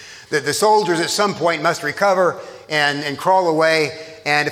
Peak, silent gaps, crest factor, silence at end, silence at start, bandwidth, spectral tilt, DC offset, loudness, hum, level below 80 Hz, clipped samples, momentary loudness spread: -2 dBFS; none; 16 dB; 0 s; 0 s; 16.5 kHz; -3.5 dB/octave; under 0.1%; -18 LUFS; none; -66 dBFS; under 0.1%; 7 LU